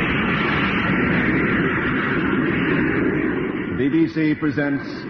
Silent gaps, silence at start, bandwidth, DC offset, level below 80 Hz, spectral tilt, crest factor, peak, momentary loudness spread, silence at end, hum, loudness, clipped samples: none; 0 s; 6.2 kHz; under 0.1%; -40 dBFS; -8.5 dB/octave; 12 dB; -8 dBFS; 4 LU; 0 s; none; -20 LUFS; under 0.1%